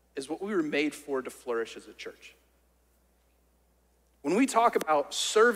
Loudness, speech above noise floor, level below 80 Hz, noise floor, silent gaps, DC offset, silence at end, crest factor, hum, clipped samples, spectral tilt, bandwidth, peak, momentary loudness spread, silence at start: -29 LUFS; 39 dB; -70 dBFS; -67 dBFS; none; under 0.1%; 0 s; 20 dB; none; under 0.1%; -3 dB/octave; 16 kHz; -12 dBFS; 18 LU; 0.15 s